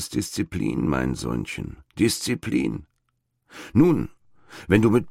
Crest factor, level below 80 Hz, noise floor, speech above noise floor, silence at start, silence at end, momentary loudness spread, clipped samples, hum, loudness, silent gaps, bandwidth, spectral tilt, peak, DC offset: 20 dB; -44 dBFS; -74 dBFS; 51 dB; 0 s; 0 s; 17 LU; under 0.1%; none; -24 LUFS; none; 16 kHz; -5.5 dB/octave; -4 dBFS; under 0.1%